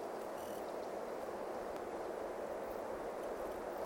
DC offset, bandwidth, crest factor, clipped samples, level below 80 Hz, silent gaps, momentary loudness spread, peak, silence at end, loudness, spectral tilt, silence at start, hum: under 0.1%; 16.5 kHz; 14 dB; under 0.1%; -68 dBFS; none; 1 LU; -30 dBFS; 0 s; -44 LUFS; -4.5 dB/octave; 0 s; none